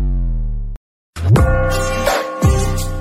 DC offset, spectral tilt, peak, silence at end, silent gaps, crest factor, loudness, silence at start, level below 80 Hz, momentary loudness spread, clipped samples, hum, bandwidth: under 0.1%; -6 dB/octave; -2 dBFS; 0 s; 0.76-1.13 s; 14 dB; -17 LUFS; 0 s; -20 dBFS; 14 LU; under 0.1%; none; 16 kHz